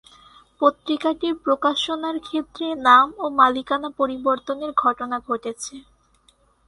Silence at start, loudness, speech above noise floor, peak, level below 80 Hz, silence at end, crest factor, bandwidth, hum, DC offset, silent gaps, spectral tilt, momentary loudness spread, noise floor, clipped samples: 0.6 s; -21 LUFS; 39 dB; 0 dBFS; -60 dBFS; 0.9 s; 22 dB; 11.5 kHz; none; under 0.1%; none; -2.5 dB/octave; 13 LU; -60 dBFS; under 0.1%